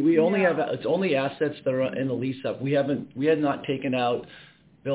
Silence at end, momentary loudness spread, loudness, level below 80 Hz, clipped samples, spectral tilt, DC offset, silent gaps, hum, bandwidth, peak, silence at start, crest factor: 0 s; 8 LU; -25 LUFS; -66 dBFS; under 0.1%; -10.5 dB/octave; under 0.1%; none; none; 4 kHz; -10 dBFS; 0 s; 16 dB